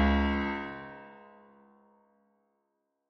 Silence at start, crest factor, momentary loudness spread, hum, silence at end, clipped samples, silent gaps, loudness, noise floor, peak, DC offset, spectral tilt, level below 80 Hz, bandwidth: 0 s; 18 dB; 24 LU; none; 1.9 s; under 0.1%; none; -31 LUFS; -80 dBFS; -16 dBFS; under 0.1%; -5 dB/octave; -40 dBFS; 6.2 kHz